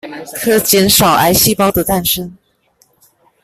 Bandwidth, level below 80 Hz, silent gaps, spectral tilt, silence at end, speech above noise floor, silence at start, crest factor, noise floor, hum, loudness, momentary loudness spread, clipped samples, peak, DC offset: 17 kHz; -38 dBFS; none; -3 dB/octave; 1.1 s; 44 dB; 0.05 s; 14 dB; -56 dBFS; none; -11 LUFS; 11 LU; under 0.1%; 0 dBFS; under 0.1%